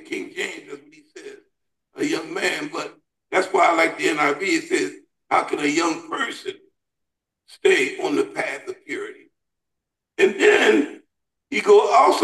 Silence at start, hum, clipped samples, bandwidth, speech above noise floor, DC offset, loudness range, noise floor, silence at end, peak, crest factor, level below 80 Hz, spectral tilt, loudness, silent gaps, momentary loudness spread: 0.1 s; none; under 0.1%; 12.5 kHz; 60 dB; under 0.1%; 5 LU; -82 dBFS; 0 s; -4 dBFS; 18 dB; -72 dBFS; -3 dB/octave; -20 LUFS; none; 19 LU